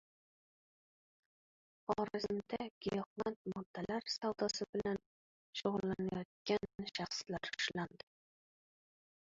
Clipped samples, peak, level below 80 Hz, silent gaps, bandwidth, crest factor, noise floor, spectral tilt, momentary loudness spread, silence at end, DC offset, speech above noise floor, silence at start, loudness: under 0.1%; -22 dBFS; -72 dBFS; 2.71-2.81 s, 3.06-3.16 s, 3.36-3.45 s, 3.66-3.74 s, 4.69-4.73 s, 5.06-5.53 s, 6.25-6.45 s; 7.6 kHz; 22 dB; under -90 dBFS; -3.5 dB/octave; 7 LU; 1.5 s; under 0.1%; over 49 dB; 1.9 s; -41 LUFS